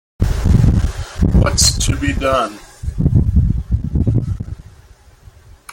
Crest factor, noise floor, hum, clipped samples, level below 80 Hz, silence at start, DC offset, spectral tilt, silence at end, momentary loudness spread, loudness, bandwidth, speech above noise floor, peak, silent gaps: 16 dB; -44 dBFS; none; under 0.1%; -20 dBFS; 0.2 s; under 0.1%; -5 dB/octave; 1.2 s; 13 LU; -16 LUFS; 16.5 kHz; 28 dB; 0 dBFS; none